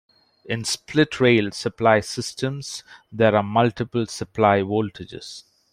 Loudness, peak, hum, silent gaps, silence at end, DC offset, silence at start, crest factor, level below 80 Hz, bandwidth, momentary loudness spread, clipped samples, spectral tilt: -21 LUFS; -2 dBFS; none; none; 0.3 s; under 0.1%; 0.45 s; 20 dB; -58 dBFS; 15.5 kHz; 18 LU; under 0.1%; -5 dB/octave